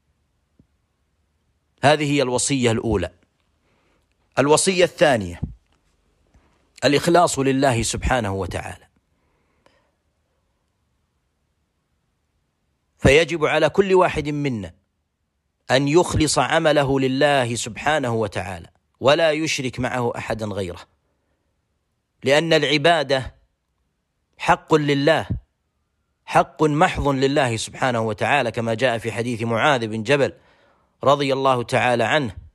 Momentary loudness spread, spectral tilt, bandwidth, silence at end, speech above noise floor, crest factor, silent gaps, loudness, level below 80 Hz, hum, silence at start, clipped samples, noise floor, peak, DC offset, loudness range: 10 LU; -4.5 dB/octave; 14.5 kHz; 0.15 s; 54 dB; 18 dB; none; -19 LUFS; -42 dBFS; none; 1.85 s; under 0.1%; -73 dBFS; -4 dBFS; under 0.1%; 4 LU